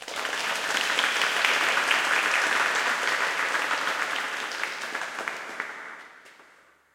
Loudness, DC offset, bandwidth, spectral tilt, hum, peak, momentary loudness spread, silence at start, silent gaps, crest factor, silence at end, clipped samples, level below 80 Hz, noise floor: -25 LUFS; under 0.1%; 17 kHz; 0.5 dB/octave; none; -4 dBFS; 12 LU; 0 s; none; 24 dB; 0.5 s; under 0.1%; -78 dBFS; -58 dBFS